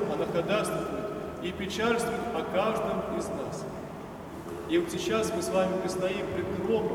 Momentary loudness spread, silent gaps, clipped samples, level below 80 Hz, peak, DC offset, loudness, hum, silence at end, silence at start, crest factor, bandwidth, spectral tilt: 11 LU; none; under 0.1%; -54 dBFS; -14 dBFS; under 0.1%; -30 LUFS; none; 0 s; 0 s; 16 dB; 19 kHz; -5 dB/octave